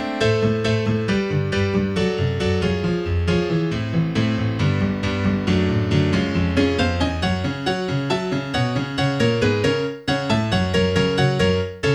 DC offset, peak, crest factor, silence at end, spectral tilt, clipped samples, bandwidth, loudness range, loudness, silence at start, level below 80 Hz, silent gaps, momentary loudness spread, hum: under 0.1%; -4 dBFS; 16 dB; 0 s; -6.5 dB/octave; under 0.1%; 11 kHz; 1 LU; -21 LUFS; 0 s; -38 dBFS; none; 4 LU; none